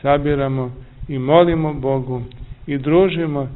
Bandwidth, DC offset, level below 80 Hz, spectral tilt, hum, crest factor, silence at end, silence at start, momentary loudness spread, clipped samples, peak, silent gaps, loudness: 4.1 kHz; 0.1%; -36 dBFS; -12 dB/octave; none; 18 dB; 0 s; 0 s; 15 LU; under 0.1%; 0 dBFS; none; -18 LUFS